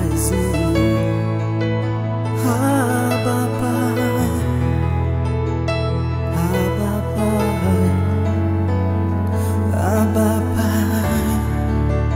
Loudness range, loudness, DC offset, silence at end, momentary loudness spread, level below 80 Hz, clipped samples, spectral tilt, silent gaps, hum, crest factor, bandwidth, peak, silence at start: 1 LU; -19 LUFS; under 0.1%; 0 s; 4 LU; -30 dBFS; under 0.1%; -7 dB/octave; none; none; 14 dB; 16 kHz; -4 dBFS; 0 s